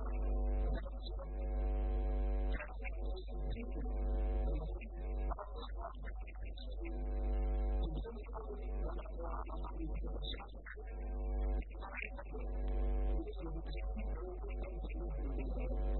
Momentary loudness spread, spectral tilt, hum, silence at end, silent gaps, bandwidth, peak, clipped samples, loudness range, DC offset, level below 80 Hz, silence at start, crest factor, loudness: 8 LU; -6.5 dB/octave; none; 0 s; none; 4.2 kHz; -28 dBFS; under 0.1%; 3 LU; under 0.1%; -40 dBFS; 0 s; 10 dB; -43 LUFS